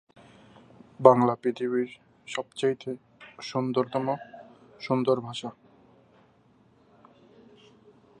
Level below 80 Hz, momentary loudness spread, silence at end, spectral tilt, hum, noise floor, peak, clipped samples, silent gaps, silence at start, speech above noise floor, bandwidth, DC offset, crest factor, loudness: -74 dBFS; 21 LU; 2.7 s; -6.5 dB/octave; none; -61 dBFS; -2 dBFS; under 0.1%; none; 1 s; 35 dB; 10 kHz; under 0.1%; 28 dB; -27 LUFS